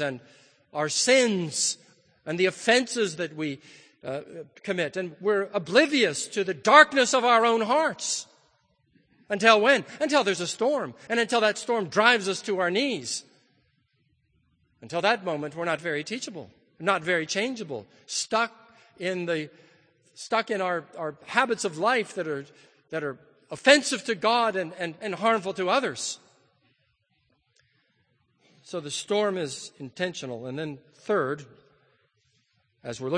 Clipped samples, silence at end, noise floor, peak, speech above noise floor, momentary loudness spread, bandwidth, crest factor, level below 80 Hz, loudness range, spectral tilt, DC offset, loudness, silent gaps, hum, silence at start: under 0.1%; 0 s; -71 dBFS; 0 dBFS; 46 dB; 16 LU; 9.8 kHz; 26 dB; -78 dBFS; 11 LU; -3 dB/octave; under 0.1%; -25 LUFS; none; none; 0 s